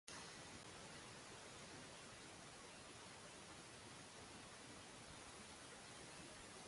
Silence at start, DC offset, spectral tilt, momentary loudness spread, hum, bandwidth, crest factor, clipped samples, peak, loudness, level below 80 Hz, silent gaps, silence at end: 0.05 s; under 0.1%; -2.5 dB/octave; 1 LU; none; 11.5 kHz; 26 dB; under 0.1%; -32 dBFS; -57 LUFS; -76 dBFS; none; 0 s